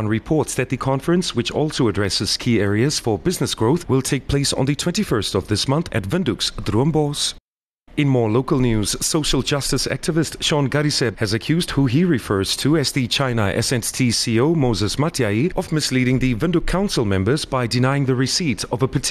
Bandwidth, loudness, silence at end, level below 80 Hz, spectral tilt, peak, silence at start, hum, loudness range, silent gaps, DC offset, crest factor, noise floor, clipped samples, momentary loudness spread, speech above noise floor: 13.5 kHz; -19 LUFS; 0 s; -36 dBFS; -5 dB/octave; -6 dBFS; 0 s; none; 2 LU; 7.40-7.53 s, 7.66-7.70 s, 7.82-7.86 s; under 0.1%; 12 dB; -53 dBFS; under 0.1%; 4 LU; 34 dB